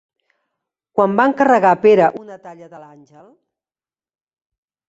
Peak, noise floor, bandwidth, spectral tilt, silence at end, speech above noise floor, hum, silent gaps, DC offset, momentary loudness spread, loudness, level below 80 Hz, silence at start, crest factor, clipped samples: -2 dBFS; under -90 dBFS; 7.8 kHz; -7 dB/octave; 2.1 s; over 74 dB; none; none; under 0.1%; 22 LU; -14 LUFS; -64 dBFS; 0.95 s; 18 dB; under 0.1%